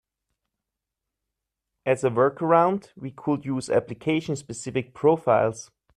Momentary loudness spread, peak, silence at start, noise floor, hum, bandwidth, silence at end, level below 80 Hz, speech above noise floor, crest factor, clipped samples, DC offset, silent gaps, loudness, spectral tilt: 12 LU; -6 dBFS; 1.85 s; -85 dBFS; none; 11.5 kHz; 0.35 s; -64 dBFS; 62 dB; 20 dB; under 0.1%; under 0.1%; none; -24 LUFS; -6 dB/octave